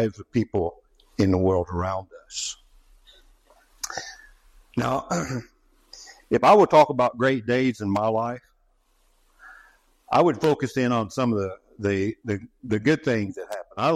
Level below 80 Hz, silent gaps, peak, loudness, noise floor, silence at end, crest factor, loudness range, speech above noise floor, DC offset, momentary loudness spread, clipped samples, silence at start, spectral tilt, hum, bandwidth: -56 dBFS; none; -4 dBFS; -23 LUFS; -64 dBFS; 0 s; 20 dB; 11 LU; 42 dB; under 0.1%; 17 LU; under 0.1%; 0 s; -6 dB/octave; none; 15 kHz